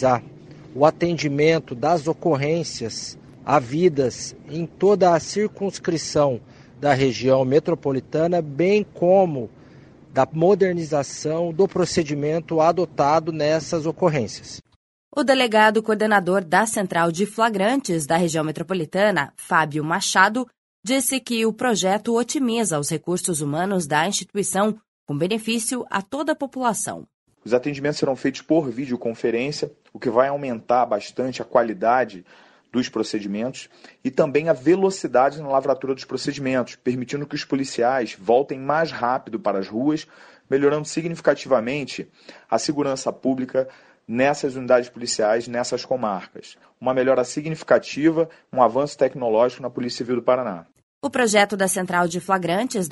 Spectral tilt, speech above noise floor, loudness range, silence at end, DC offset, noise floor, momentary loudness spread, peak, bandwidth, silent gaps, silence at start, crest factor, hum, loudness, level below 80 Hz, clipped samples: -4.5 dB/octave; 26 dB; 4 LU; 0 s; under 0.1%; -47 dBFS; 10 LU; -2 dBFS; 11.5 kHz; 14.76-15.11 s, 20.58-20.83 s, 24.88-25.07 s, 27.14-27.26 s, 50.83-51.01 s; 0 s; 20 dB; none; -22 LUFS; -60 dBFS; under 0.1%